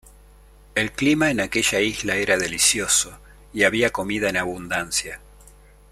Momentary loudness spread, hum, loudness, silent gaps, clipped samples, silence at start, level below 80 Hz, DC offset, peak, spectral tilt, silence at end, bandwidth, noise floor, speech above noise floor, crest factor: 9 LU; 50 Hz at -45 dBFS; -21 LUFS; none; under 0.1%; 0.75 s; -48 dBFS; under 0.1%; -4 dBFS; -2.5 dB/octave; 0.75 s; 16 kHz; -49 dBFS; 27 dB; 20 dB